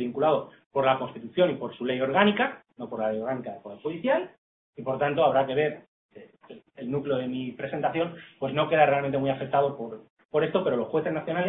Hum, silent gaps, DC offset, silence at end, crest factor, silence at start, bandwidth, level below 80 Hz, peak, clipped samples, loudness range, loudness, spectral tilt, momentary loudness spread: none; 0.66-0.70 s, 4.38-4.73 s, 5.88-6.09 s, 10.10-10.17 s, 10.25-10.29 s; under 0.1%; 0 s; 22 dB; 0 s; 4 kHz; -68 dBFS; -4 dBFS; under 0.1%; 3 LU; -27 LUFS; -10 dB/octave; 14 LU